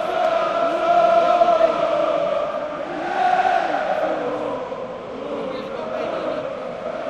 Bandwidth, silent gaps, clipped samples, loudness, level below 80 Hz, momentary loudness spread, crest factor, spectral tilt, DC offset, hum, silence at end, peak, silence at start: 8.8 kHz; none; under 0.1%; -21 LUFS; -56 dBFS; 13 LU; 18 dB; -5 dB/octave; under 0.1%; none; 0 s; -4 dBFS; 0 s